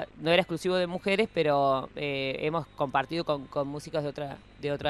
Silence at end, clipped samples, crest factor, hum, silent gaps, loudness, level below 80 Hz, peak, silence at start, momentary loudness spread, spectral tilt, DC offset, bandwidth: 0 s; under 0.1%; 22 dB; none; none; -29 LUFS; -58 dBFS; -8 dBFS; 0 s; 9 LU; -5.5 dB/octave; under 0.1%; 13 kHz